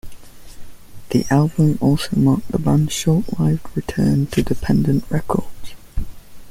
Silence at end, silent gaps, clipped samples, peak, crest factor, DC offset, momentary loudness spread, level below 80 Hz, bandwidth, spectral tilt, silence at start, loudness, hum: 0 s; none; under 0.1%; -2 dBFS; 16 dB; under 0.1%; 15 LU; -36 dBFS; 16 kHz; -7 dB/octave; 0.05 s; -18 LUFS; none